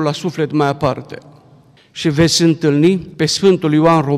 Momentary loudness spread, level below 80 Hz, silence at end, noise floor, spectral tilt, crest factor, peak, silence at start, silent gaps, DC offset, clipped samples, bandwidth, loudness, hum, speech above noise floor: 13 LU; -48 dBFS; 0 s; -47 dBFS; -5.5 dB/octave; 12 dB; -2 dBFS; 0 s; none; under 0.1%; under 0.1%; 15 kHz; -14 LUFS; none; 33 dB